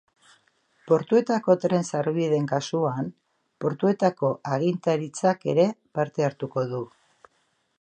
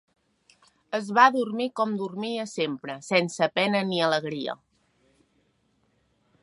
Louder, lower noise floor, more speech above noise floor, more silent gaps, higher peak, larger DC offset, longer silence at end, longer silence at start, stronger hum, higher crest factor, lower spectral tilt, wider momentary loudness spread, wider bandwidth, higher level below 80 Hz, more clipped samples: about the same, -25 LUFS vs -25 LUFS; about the same, -70 dBFS vs -69 dBFS; about the same, 46 dB vs 44 dB; neither; about the same, -6 dBFS vs -4 dBFS; neither; second, 0.95 s vs 1.9 s; about the same, 0.85 s vs 0.9 s; neither; about the same, 20 dB vs 24 dB; first, -6.5 dB/octave vs -4.5 dB/octave; second, 8 LU vs 14 LU; second, 9.4 kHz vs 11.5 kHz; about the same, -72 dBFS vs -76 dBFS; neither